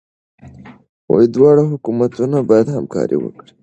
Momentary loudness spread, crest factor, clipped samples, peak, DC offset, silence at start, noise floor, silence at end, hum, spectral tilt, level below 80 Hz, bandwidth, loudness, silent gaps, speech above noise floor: 9 LU; 16 dB; under 0.1%; 0 dBFS; under 0.1%; 0.45 s; -39 dBFS; 0.35 s; none; -9 dB/octave; -54 dBFS; 8.2 kHz; -14 LUFS; 0.89-1.08 s; 25 dB